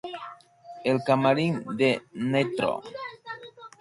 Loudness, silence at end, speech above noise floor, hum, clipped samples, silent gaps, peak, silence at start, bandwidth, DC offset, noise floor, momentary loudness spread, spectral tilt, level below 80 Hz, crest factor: -26 LUFS; 0.1 s; 22 dB; none; under 0.1%; none; -8 dBFS; 0.05 s; 11.5 kHz; under 0.1%; -47 dBFS; 18 LU; -6.5 dB/octave; -68 dBFS; 18 dB